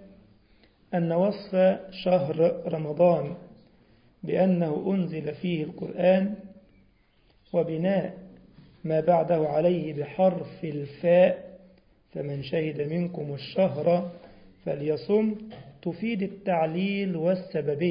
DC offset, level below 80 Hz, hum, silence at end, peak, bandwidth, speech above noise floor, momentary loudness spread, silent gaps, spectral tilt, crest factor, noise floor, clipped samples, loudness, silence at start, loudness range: under 0.1%; -64 dBFS; none; 0 s; -8 dBFS; 5.4 kHz; 37 dB; 13 LU; none; -11.5 dB/octave; 18 dB; -63 dBFS; under 0.1%; -26 LUFS; 0 s; 4 LU